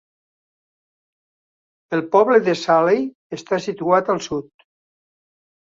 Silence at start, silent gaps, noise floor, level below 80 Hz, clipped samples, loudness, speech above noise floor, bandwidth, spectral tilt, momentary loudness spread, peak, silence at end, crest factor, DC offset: 1.9 s; 3.15-3.30 s; under -90 dBFS; -64 dBFS; under 0.1%; -19 LUFS; over 72 dB; 7.8 kHz; -5.5 dB/octave; 13 LU; -2 dBFS; 1.35 s; 20 dB; under 0.1%